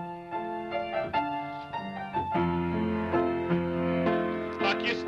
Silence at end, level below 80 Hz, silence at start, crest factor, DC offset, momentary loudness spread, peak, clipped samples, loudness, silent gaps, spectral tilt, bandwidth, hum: 0 s; -54 dBFS; 0 s; 14 dB; under 0.1%; 9 LU; -14 dBFS; under 0.1%; -30 LUFS; none; -7.5 dB/octave; 7.4 kHz; none